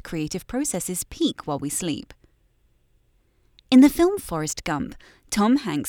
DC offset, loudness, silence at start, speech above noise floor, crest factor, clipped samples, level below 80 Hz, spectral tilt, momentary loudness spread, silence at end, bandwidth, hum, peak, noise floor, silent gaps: under 0.1%; -23 LUFS; 0.05 s; 41 dB; 20 dB; under 0.1%; -50 dBFS; -4.5 dB/octave; 14 LU; 0 s; 19.5 kHz; none; -4 dBFS; -63 dBFS; none